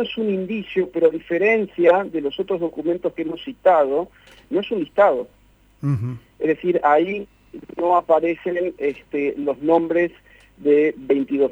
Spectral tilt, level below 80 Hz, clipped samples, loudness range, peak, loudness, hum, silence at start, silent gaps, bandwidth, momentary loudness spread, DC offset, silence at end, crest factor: -8 dB/octave; -58 dBFS; under 0.1%; 1 LU; -2 dBFS; -20 LUFS; none; 0 s; none; 7.6 kHz; 9 LU; under 0.1%; 0 s; 18 dB